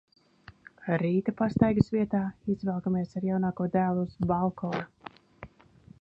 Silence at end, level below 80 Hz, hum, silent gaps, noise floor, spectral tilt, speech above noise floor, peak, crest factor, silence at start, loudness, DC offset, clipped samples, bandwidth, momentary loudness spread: 0.55 s; -54 dBFS; none; none; -56 dBFS; -9.5 dB/octave; 28 dB; -6 dBFS; 22 dB; 0.8 s; -29 LUFS; under 0.1%; under 0.1%; 7.2 kHz; 10 LU